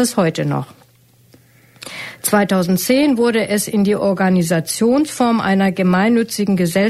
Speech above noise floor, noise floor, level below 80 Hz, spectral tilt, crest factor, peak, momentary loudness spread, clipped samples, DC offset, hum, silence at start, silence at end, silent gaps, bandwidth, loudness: 35 dB; -50 dBFS; -54 dBFS; -5.5 dB/octave; 14 dB; -2 dBFS; 9 LU; under 0.1%; under 0.1%; none; 0 s; 0 s; none; 14.5 kHz; -16 LUFS